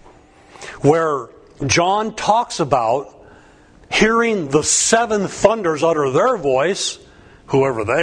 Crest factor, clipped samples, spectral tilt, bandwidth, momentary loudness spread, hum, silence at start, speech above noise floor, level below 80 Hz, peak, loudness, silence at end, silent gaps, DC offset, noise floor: 18 dB; under 0.1%; -3.5 dB/octave; 10.5 kHz; 10 LU; none; 0.6 s; 30 dB; -46 dBFS; 0 dBFS; -17 LUFS; 0 s; none; under 0.1%; -47 dBFS